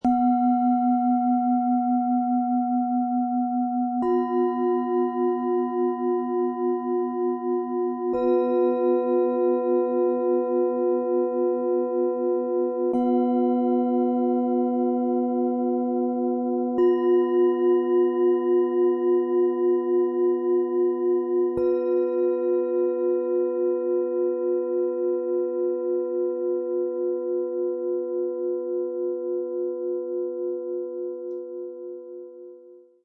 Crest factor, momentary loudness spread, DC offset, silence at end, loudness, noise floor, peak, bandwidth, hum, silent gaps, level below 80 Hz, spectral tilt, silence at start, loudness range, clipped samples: 12 dB; 7 LU; under 0.1%; 0.25 s; -24 LUFS; -49 dBFS; -12 dBFS; 3 kHz; none; none; -68 dBFS; -9.5 dB/octave; 0.05 s; 6 LU; under 0.1%